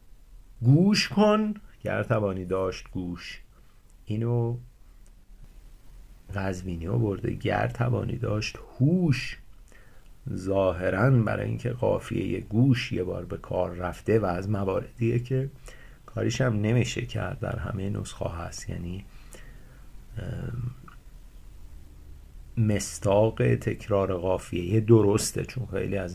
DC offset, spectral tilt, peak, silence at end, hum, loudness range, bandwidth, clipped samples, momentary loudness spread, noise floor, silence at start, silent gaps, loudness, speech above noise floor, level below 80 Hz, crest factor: under 0.1%; -6.5 dB/octave; -6 dBFS; 0 s; none; 10 LU; 14.5 kHz; under 0.1%; 14 LU; -53 dBFS; 0.05 s; none; -27 LUFS; 27 dB; -46 dBFS; 20 dB